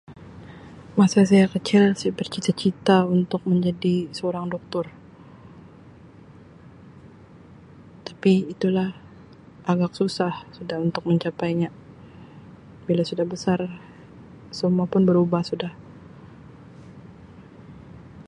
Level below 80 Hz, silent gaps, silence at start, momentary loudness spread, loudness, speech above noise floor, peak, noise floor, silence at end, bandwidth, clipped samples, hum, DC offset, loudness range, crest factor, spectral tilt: -58 dBFS; none; 0.1 s; 25 LU; -23 LUFS; 26 dB; -4 dBFS; -47 dBFS; 0.05 s; 11 kHz; under 0.1%; none; under 0.1%; 9 LU; 20 dB; -7 dB/octave